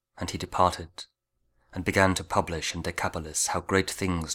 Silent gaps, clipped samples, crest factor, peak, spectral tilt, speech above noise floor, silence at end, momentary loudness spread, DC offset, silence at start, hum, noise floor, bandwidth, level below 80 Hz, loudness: none; under 0.1%; 24 dB; -6 dBFS; -3.5 dB/octave; 45 dB; 0 s; 16 LU; under 0.1%; 0.15 s; none; -72 dBFS; 18.5 kHz; -48 dBFS; -27 LUFS